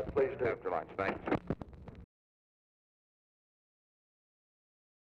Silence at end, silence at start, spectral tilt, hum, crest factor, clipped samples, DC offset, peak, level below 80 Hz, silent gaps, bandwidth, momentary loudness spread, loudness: 3 s; 0 s; -8.5 dB/octave; none; 18 dB; under 0.1%; under 0.1%; -22 dBFS; -58 dBFS; none; 7 kHz; 17 LU; -36 LUFS